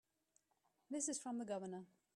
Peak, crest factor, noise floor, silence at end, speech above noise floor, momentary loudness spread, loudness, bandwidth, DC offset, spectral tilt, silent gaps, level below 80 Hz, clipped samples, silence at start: -30 dBFS; 20 dB; -83 dBFS; 0.3 s; 37 dB; 9 LU; -46 LUFS; 14 kHz; under 0.1%; -3.5 dB/octave; none; under -90 dBFS; under 0.1%; 0.9 s